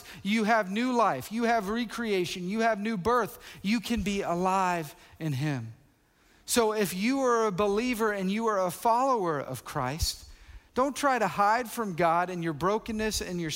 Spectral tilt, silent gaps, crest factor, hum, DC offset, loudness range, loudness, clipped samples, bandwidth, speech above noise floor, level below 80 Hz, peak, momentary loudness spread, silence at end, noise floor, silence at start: -4.5 dB/octave; none; 16 dB; none; under 0.1%; 3 LU; -28 LUFS; under 0.1%; 16 kHz; 36 dB; -50 dBFS; -12 dBFS; 8 LU; 0 s; -63 dBFS; 0 s